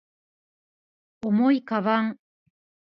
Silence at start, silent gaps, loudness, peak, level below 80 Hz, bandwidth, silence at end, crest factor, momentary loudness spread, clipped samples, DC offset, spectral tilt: 1.25 s; none; -24 LUFS; -10 dBFS; -74 dBFS; 5.8 kHz; 0.85 s; 18 dB; 9 LU; under 0.1%; under 0.1%; -8.5 dB/octave